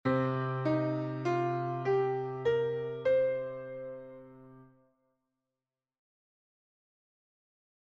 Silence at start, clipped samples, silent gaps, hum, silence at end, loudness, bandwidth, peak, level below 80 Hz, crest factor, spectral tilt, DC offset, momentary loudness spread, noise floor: 0.05 s; under 0.1%; none; none; 3.2 s; -32 LUFS; 7.2 kHz; -18 dBFS; -70 dBFS; 16 dB; -8.5 dB/octave; under 0.1%; 14 LU; under -90 dBFS